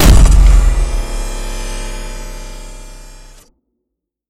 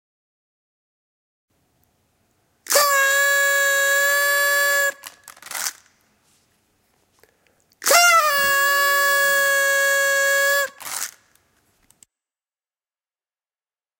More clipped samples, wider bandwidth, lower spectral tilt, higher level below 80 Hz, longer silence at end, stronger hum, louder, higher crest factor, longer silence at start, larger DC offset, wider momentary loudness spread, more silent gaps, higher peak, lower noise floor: first, 1% vs under 0.1%; about the same, 16 kHz vs 17 kHz; first, -5 dB/octave vs 2.5 dB/octave; first, -14 dBFS vs -70 dBFS; second, 1.2 s vs 2.9 s; neither; about the same, -15 LUFS vs -17 LUFS; second, 12 dB vs 22 dB; second, 0 s vs 2.7 s; neither; first, 24 LU vs 13 LU; neither; about the same, 0 dBFS vs 0 dBFS; second, -76 dBFS vs under -90 dBFS